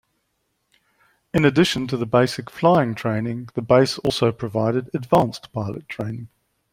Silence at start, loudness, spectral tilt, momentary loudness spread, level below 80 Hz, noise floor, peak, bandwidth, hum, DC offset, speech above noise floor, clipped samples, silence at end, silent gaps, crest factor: 1.35 s; -21 LUFS; -6 dB/octave; 12 LU; -54 dBFS; -72 dBFS; -2 dBFS; 16 kHz; none; under 0.1%; 52 dB; under 0.1%; 0.45 s; none; 20 dB